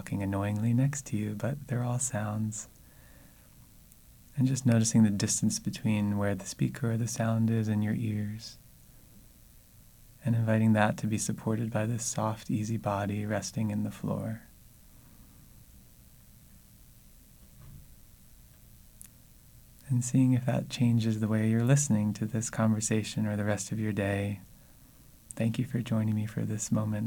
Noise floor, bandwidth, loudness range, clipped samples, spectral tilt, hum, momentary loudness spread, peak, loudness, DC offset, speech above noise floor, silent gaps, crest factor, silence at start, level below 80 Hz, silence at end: -56 dBFS; 19 kHz; 7 LU; under 0.1%; -6 dB/octave; none; 9 LU; -8 dBFS; -30 LUFS; under 0.1%; 27 dB; none; 22 dB; 0 s; -58 dBFS; 0 s